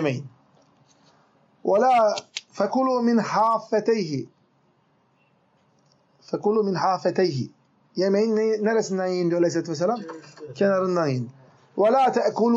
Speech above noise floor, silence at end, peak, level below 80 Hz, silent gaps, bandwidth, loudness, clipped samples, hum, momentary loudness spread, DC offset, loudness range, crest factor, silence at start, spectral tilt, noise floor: 42 dB; 0 s; -8 dBFS; -78 dBFS; none; 8 kHz; -23 LUFS; under 0.1%; none; 14 LU; under 0.1%; 5 LU; 16 dB; 0 s; -6 dB/octave; -64 dBFS